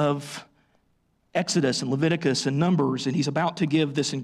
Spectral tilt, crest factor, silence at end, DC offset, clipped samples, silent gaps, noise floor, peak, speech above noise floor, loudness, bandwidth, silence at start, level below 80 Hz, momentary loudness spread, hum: -5 dB/octave; 12 dB; 0 s; under 0.1%; under 0.1%; none; -68 dBFS; -12 dBFS; 44 dB; -24 LUFS; 13 kHz; 0 s; -66 dBFS; 7 LU; none